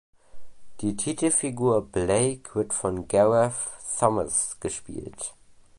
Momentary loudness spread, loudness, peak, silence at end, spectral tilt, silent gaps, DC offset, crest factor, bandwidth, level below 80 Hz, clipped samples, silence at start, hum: 13 LU; -25 LUFS; -6 dBFS; 0 s; -4.5 dB/octave; none; under 0.1%; 20 dB; 11.5 kHz; -52 dBFS; under 0.1%; 0.35 s; none